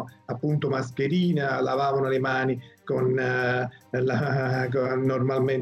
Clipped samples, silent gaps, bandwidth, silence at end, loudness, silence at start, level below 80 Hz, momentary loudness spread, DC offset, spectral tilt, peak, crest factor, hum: under 0.1%; none; 8 kHz; 0 s; -26 LUFS; 0 s; -64 dBFS; 5 LU; under 0.1%; -7.5 dB/octave; -16 dBFS; 10 dB; none